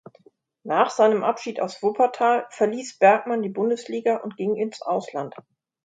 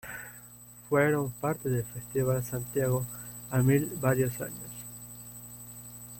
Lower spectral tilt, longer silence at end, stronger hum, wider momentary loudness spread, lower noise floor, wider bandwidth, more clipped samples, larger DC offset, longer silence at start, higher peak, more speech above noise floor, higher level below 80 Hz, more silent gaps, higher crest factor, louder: second, -5 dB/octave vs -6.5 dB/octave; first, 0.55 s vs 0 s; second, none vs 60 Hz at -45 dBFS; second, 10 LU vs 18 LU; first, -57 dBFS vs -51 dBFS; second, 9.2 kHz vs 16.5 kHz; neither; neither; first, 0.65 s vs 0.05 s; first, -4 dBFS vs -12 dBFS; first, 35 dB vs 22 dB; second, -76 dBFS vs -58 dBFS; neither; about the same, 20 dB vs 18 dB; first, -23 LUFS vs -30 LUFS